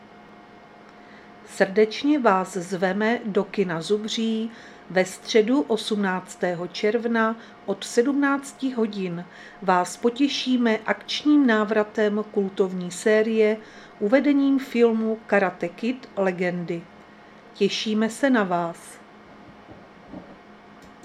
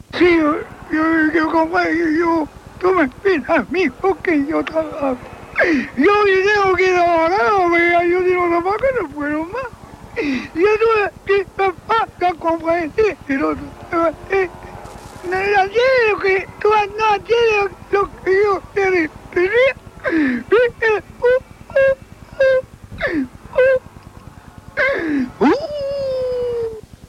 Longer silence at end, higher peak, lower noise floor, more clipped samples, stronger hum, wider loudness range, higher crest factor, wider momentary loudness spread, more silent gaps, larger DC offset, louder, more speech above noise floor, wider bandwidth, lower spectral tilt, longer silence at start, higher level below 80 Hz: second, 0.15 s vs 0.3 s; about the same, -4 dBFS vs -2 dBFS; first, -48 dBFS vs -39 dBFS; neither; neither; about the same, 4 LU vs 5 LU; first, 20 dB vs 14 dB; about the same, 11 LU vs 9 LU; neither; neither; second, -23 LUFS vs -17 LUFS; about the same, 25 dB vs 23 dB; first, 13.5 kHz vs 12 kHz; about the same, -5 dB/octave vs -5.5 dB/octave; about the same, 0.15 s vs 0.15 s; second, -68 dBFS vs -44 dBFS